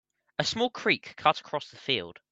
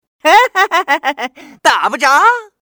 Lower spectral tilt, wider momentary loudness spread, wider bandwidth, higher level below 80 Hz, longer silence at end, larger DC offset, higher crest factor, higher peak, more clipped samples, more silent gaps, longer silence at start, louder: first, -3.5 dB/octave vs -0.5 dB/octave; about the same, 9 LU vs 9 LU; second, 8.4 kHz vs over 20 kHz; second, -70 dBFS vs -60 dBFS; about the same, 0.2 s vs 0.2 s; neither; first, 22 dB vs 12 dB; second, -8 dBFS vs 0 dBFS; second, under 0.1% vs 0.1%; neither; first, 0.4 s vs 0.25 s; second, -29 LUFS vs -11 LUFS